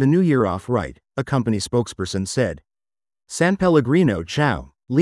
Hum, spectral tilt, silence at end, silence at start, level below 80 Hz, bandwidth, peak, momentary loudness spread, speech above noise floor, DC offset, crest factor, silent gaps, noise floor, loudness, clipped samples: none; -6 dB/octave; 0 s; 0 s; -48 dBFS; 12 kHz; -4 dBFS; 12 LU; over 71 dB; under 0.1%; 16 dB; none; under -90 dBFS; -21 LUFS; under 0.1%